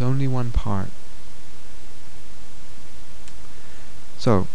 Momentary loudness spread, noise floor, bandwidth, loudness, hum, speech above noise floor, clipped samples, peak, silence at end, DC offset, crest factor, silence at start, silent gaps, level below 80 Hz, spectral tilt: 23 LU; -45 dBFS; 11 kHz; -25 LUFS; none; 23 dB; under 0.1%; -4 dBFS; 0.05 s; 20%; 22 dB; 0 s; none; -36 dBFS; -7.5 dB/octave